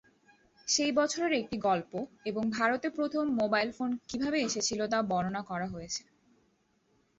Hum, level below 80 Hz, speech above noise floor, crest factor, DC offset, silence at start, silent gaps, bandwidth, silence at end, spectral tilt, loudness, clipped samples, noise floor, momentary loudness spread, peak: none; -66 dBFS; 41 dB; 18 dB; under 0.1%; 0.65 s; none; 8.2 kHz; 1.2 s; -3.5 dB/octave; -31 LUFS; under 0.1%; -72 dBFS; 9 LU; -14 dBFS